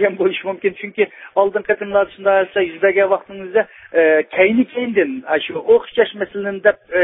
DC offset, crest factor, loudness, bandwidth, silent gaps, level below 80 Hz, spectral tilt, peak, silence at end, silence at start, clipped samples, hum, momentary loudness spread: under 0.1%; 16 dB; -17 LUFS; 3.9 kHz; none; -58 dBFS; -9.5 dB/octave; 0 dBFS; 0 s; 0 s; under 0.1%; none; 7 LU